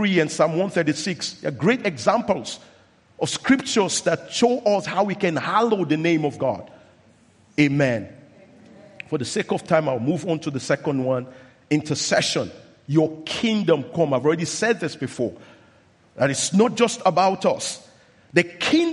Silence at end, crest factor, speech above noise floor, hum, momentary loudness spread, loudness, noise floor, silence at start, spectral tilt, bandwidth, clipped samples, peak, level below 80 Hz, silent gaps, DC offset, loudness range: 0 s; 22 dB; 34 dB; none; 9 LU; -22 LUFS; -56 dBFS; 0 s; -4.5 dB/octave; 11.5 kHz; under 0.1%; 0 dBFS; -64 dBFS; none; under 0.1%; 3 LU